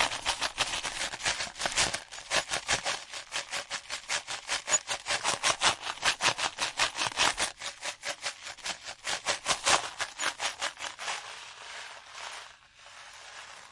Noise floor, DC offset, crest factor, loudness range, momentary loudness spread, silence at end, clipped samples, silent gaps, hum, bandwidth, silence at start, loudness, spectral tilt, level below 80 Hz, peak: -53 dBFS; under 0.1%; 26 dB; 5 LU; 16 LU; 0 s; under 0.1%; none; none; 11.5 kHz; 0 s; -30 LUFS; 0.5 dB/octave; -60 dBFS; -8 dBFS